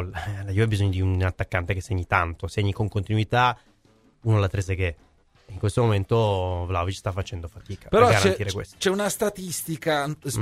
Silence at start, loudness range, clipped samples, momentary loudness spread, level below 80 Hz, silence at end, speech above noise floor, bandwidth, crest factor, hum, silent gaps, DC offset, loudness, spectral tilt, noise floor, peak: 0 s; 3 LU; under 0.1%; 10 LU; -44 dBFS; 0 s; 36 dB; 15.5 kHz; 20 dB; none; none; under 0.1%; -24 LUFS; -5.5 dB/octave; -59 dBFS; -4 dBFS